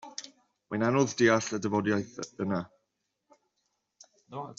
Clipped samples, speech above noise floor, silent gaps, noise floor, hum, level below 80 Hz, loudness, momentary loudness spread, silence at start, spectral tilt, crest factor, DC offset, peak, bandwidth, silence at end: under 0.1%; 53 dB; none; -81 dBFS; none; -70 dBFS; -29 LUFS; 19 LU; 0.05 s; -5 dB/octave; 22 dB; under 0.1%; -10 dBFS; 7.8 kHz; 0.05 s